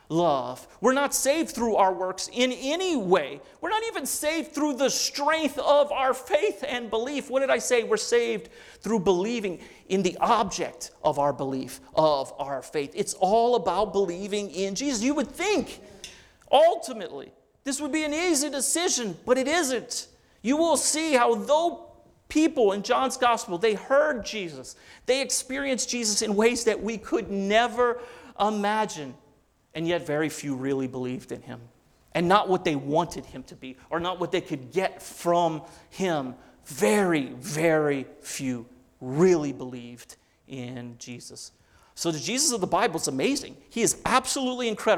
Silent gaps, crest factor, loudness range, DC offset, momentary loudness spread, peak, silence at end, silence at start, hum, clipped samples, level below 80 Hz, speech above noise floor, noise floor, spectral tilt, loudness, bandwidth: none; 20 dB; 5 LU; under 0.1%; 16 LU; -6 dBFS; 0 s; 0.1 s; none; under 0.1%; -58 dBFS; 36 dB; -62 dBFS; -3.5 dB/octave; -25 LUFS; 19 kHz